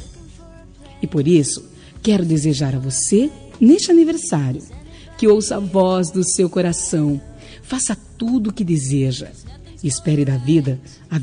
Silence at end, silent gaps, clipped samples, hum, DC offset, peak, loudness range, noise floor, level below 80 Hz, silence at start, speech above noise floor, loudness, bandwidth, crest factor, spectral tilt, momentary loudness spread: 0 s; none; under 0.1%; none; under 0.1%; -2 dBFS; 5 LU; -41 dBFS; -44 dBFS; 0 s; 24 dB; -18 LUFS; 10 kHz; 16 dB; -5.5 dB/octave; 13 LU